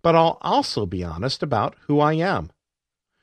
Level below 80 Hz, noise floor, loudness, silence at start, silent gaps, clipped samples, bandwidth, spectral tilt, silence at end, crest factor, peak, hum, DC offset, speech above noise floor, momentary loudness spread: -48 dBFS; -86 dBFS; -22 LUFS; 0.05 s; none; under 0.1%; 10 kHz; -6 dB/octave; 0.75 s; 20 dB; -2 dBFS; none; under 0.1%; 65 dB; 9 LU